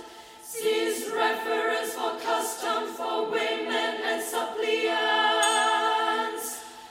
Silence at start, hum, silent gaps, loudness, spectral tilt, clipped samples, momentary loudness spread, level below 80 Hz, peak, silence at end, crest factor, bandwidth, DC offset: 0 s; none; none; -26 LUFS; -0.5 dB/octave; under 0.1%; 9 LU; -74 dBFS; -10 dBFS; 0 s; 16 dB; 16.5 kHz; under 0.1%